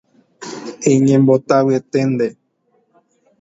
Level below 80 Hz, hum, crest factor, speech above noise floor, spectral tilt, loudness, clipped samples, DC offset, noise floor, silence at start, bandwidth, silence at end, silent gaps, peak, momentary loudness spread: -60 dBFS; none; 16 dB; 48 dB; -7 dB/octave; -15 LUFS; under 0.1%; under 0.1%; -62 dBFS; 0.4 s; 8 kHz; 1.1 s; none; 0 dBFS; 18 LU